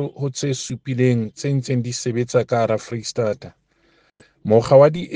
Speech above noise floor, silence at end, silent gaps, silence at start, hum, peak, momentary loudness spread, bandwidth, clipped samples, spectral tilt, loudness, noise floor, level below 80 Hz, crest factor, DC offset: 41 dB; 0 s; none; 0 s; none; 0 dBFS; 13 LU; 10 kHz; under 0.1%; -6 dB/octave; -19 LUFS; -60 dBFS; -56 dBFS; 20 dB; under 0.1%